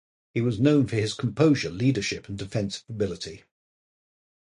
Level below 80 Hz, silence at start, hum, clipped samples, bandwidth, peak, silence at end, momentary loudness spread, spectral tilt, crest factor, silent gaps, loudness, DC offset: -54 dBFS; 0.35 s; none; under 0.1%; 11.5 kHz; -8 dBFS; 1.15 s; 12 LU; -6 dB/octave; 18 dB; none; -25 LUFS; under 0.1%